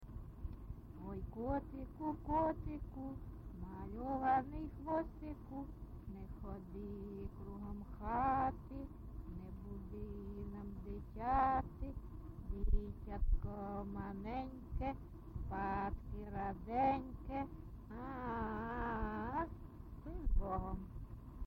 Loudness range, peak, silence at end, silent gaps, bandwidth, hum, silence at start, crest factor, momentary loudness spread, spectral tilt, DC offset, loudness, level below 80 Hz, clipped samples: 3 LU; -22 dBFS; 0 s; none; 16 kHz; none; 0 s; 20 dB; 15 LU; -9.5 dB/octave; under 0.1%; -43 LUFS; -46 dBFS; under 0.1%